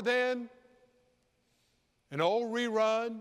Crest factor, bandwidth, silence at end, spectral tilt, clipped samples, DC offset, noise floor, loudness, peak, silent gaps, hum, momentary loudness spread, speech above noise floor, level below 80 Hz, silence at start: 18 dB; 13 kHz; 0 s; -4.5 dB/octave; under 0.1%; under 0.1%; -74 dBFS; -31 LUFS; -16 dBFS; none; none; 11 LU; 43 dB; -82 dBFS; 0 s